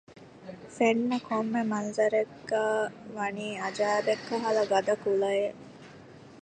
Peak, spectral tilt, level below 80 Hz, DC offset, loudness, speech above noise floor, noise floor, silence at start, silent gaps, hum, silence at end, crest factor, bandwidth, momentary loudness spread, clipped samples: -10 dBFS; -5 dB/octave; -72 dBFS; under 0.1%; -29 LUFS; 22 dB; -50 dBFS; 0.1 s; none; none; 0.05 s; 18 dB; 9.4 kHz; 20 LU; under 0.1%